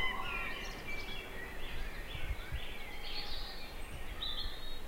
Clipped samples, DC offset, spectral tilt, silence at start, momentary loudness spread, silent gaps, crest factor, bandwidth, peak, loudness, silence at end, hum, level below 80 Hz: under 0.1%; under 0.1%; -3.5 dB/octave; 0 s; 7 LU; none; 16 dB; 16 kHz; -22 dBFS; -42 LUFS; 0 s; none; -44 dBFS